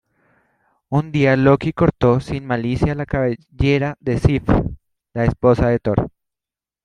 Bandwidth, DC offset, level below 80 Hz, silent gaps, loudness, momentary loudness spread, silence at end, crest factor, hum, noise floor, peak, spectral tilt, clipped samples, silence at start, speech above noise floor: 10 kHz; under 0.1%; -34 dBFS; none; -18 LUFS; 7 LU; 0.75 s; 18 dB; none; -89 dBFS; 0 dBFS; -8.5 dB/octave; under 0.1%; 0.9 s; 72 dB